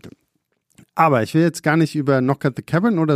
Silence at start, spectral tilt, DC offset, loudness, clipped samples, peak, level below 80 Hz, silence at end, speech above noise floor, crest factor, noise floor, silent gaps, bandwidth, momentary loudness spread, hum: 0.05 s; -7 dB/octave; under 0.1%; -18 LUFS; under 0.1%; 0 dBFS; -62 dBFS; 0 s; 53 dB; 18 dB; -70 dBFS; none; 15 kHz; 4 LU; none